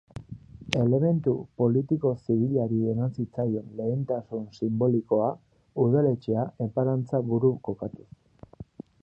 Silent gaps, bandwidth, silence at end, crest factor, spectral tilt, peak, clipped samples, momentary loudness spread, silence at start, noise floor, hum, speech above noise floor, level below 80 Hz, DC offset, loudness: none; 7.8 kHz; 0.4 s; 22 dB; -8.5 dB/octave; -4 dBFS; under 0.1%; 15 LU; 0.15 s; -47 dBFS; none; 21 dB; -58 dBFS; under 0.1%; -27 LUFS